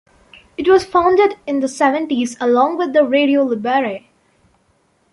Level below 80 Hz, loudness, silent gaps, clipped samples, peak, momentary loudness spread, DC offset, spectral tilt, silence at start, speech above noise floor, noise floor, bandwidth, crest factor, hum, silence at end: -54 dBFS; -16 LUFS; none; under 0.1%; -2 dBFS; 8 LU; under 0.1%; -4.5 dB/octave; 0.6 s; 45 dB; -60 dBFS; 11.5 kHz; 14 dB; none; 1.15 s